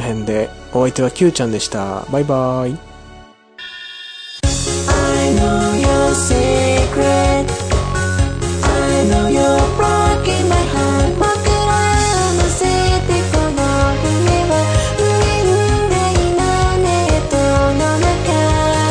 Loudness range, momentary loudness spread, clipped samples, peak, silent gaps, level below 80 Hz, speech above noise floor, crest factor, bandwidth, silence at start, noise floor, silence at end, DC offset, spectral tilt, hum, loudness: 5 LU; 6 LU; under 0.1%; -2 dBFS; none; -24 dBFS; 25 dB; 12 dB; 10.5 kHz; 0 s; -40 dBFS; 0 s; under 0.1%; -5 dB/octave; none; -15 LUFS